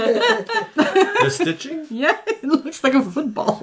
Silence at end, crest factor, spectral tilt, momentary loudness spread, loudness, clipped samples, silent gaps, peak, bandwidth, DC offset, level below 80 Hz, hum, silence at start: 0 s; 16 dB; -4.5 dB/octave; 6 LU; -19 LUFS; under 0.1%; none; -4 dBFS; 8 kHz; under 0.1%; -66 dBFS; none; 0 s